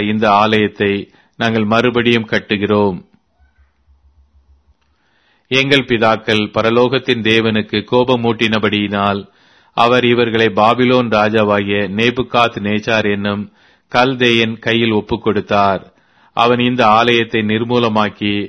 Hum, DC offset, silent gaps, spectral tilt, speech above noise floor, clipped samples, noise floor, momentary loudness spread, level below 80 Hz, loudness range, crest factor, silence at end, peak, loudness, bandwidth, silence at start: none; under 0.1%; none; -6 dB/octave; 46 dB; under 0.1%; -59 dBFS; 6 LU; -48 dBFS; 4 LU; 14 dB; 0 s; 0 dBFS; -14 LUFS; 11 kHz; 0 s